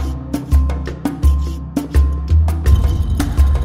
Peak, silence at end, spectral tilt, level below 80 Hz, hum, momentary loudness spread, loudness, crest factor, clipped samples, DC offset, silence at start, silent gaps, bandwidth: -2 dBFS; 0 s; -7.5 dB/octave; -16 dBFS; none; 8 LU; -17 LUFS; 14 dB; under 0.1%; under 0.1%; 0 s; none; 14.5 kHz